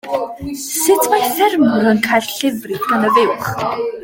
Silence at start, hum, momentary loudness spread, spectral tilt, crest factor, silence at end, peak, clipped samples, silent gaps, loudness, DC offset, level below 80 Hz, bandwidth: 0.05 s; none; 9 LU; -3.5 dB/octave; 14 dB; 0 s; 0 dBFS; under 0.1%; none; -15 LUFS; under 0.1%; -50 dBFS; 17 kHz